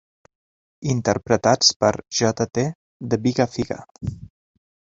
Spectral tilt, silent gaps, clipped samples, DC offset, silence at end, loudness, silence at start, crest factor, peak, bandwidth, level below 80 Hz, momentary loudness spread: -4 dB/octave; 1.76-1.80 s, 2.75-3.00 s, 3.91-3.95 s; under 0.1%; under 0.1%; 0.6 s; -21 LUFS; 0.8 s; 22 dB; -2 dBFS; 7.8 kHz; -50 dBFS; 17 LU